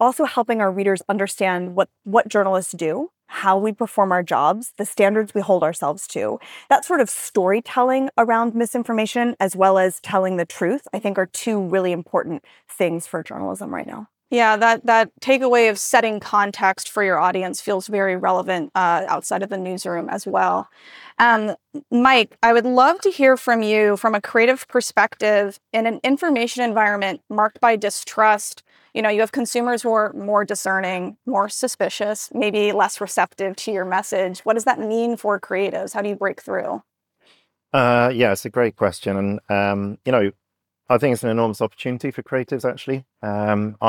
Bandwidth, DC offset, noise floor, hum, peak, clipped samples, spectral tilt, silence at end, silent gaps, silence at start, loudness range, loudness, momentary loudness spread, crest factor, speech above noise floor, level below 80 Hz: 19.5 kHz; under 0.1%; -60 dBFS; none; -4 dBFS; under 0.1%; -4.5 dB/octave; 0 s; none; 0 s; 5 LU; -20 LUFS; 10 LU; 16 dB; 40 dB; -68 dBFS